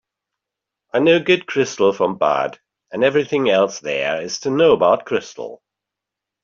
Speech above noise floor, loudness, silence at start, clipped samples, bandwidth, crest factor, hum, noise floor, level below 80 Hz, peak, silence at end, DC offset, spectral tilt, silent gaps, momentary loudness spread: 67 dB; -18 LUFS; 0.95 s; under 0.1%; 7.4 kHz; 16 dB; none; -84 dBFS; -64 dBFS; -2 dBFS; 0.9 s; under 0.1%; -4.5 dB/octave; none; 11 LU